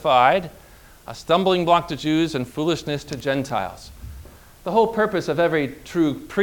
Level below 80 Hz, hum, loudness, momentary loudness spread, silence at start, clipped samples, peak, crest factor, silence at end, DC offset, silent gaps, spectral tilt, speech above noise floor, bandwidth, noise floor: -48 dBFS; none; -21 LUFS; 19 LU; 0 s; under 0.1%; -2 dBFS; 20 dB; 0 s; under 0.1%; none; -5.5 dB/octave; 22 dB; 19.5 kHz; -43 dBFS